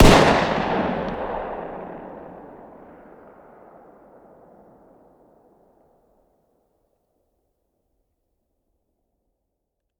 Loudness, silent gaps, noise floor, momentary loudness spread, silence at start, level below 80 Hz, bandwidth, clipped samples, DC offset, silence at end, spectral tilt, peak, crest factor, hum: -21 LUFS; none; -79 dBFS; 29 LU; 0 s; -32 dBFS; 16.5 kHz; under 0.1%; under 0.1%; 7.55 s; -5 dB/octave; 0 dBFS; 24 dB; none